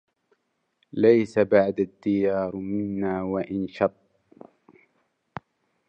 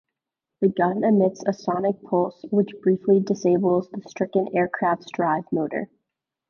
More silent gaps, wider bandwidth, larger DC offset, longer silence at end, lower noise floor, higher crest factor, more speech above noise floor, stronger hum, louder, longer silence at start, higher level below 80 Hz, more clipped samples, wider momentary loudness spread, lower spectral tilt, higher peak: neither; first, 8.6 kHz vs 7 kHz; neither; first, 2 s vs 0.65 s; second, -72 dBFS vs -85 dBFS; about the same, 20 dB vs 16 dB; second, 49 dB vs 63 dB; neither; about the same, -24 LUFS vs -23 LUFS; first, 0.95 s vs 0.6 s; first, -60 dBFS vs -66 dBFS; neither; first, 19 LU vs 7 LU; about the same, -8.5 dB/octave vs -8 dB/octave; about the same, -6 dBFS vs -6 dBFS